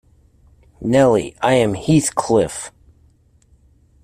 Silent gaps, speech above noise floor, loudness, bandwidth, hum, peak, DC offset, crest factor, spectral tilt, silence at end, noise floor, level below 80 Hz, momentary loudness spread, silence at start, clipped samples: none; 38 dB; -17 LUFS; 15.5 kHz; none; -2 dBFS; under 0.1%; 16 dB; -5.5 dB/octave; 1.35 s; -54 dBFS; -48 dBFS; 14 LU; 0.8 s; under 0.1%